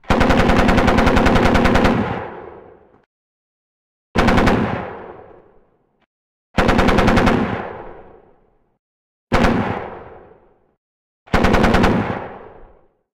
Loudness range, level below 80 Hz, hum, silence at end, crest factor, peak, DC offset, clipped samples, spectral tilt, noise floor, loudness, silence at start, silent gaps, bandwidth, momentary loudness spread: 7 LU; -26 dBFS; none; 0.5 s; 12 dB; -6 dBFS; under 0.1%; under 0.1%; -6.5 dB/octave; -56 dBFS; -16 LUFS; 0.1 s; 3.06-4.14 s, 6.06-6.54 s, 8.79-9.27 s, 10.77-11.26 s; 16 kHz; 20 LU